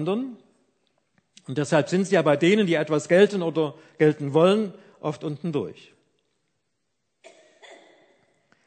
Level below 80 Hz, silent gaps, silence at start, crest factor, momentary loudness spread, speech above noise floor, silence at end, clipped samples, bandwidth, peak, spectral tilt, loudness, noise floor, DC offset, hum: -74 dBFS; none; 0 s; 20 dB; 14 LU; 56 dB; 0.9 s; under 0.1%; 9.2 kHz; -4 dBFS; -6 dB/octave; -23 LUFS; -78 dBFS; under 0.1%; none